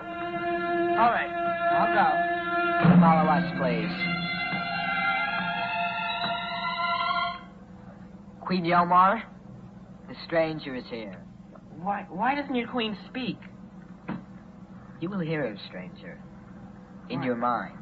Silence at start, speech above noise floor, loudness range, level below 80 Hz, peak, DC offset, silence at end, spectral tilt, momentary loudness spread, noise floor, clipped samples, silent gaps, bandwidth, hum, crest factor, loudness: 0 s; 20 dB; 12 LU; -58 dBFS; -8 dBFS; under 0.1%; 0 s; -8.5 dB/octave; 24 LU; -46 dBFS; under 0.1%; none; 4.9 kHz; none; 20 dB; -26 LUFS